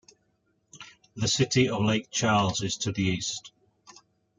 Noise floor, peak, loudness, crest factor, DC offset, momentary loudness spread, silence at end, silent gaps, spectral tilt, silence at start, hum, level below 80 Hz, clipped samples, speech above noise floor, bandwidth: -72 dBFS; -10 dBFS; -26 LUFS; 20 dB; under 0.1%; 22 LU; 0.9 s; none; -4 dB/octave; 0.75 s; none; -58 dBFS; under 0.1%; 46 dB; 9.6 kHz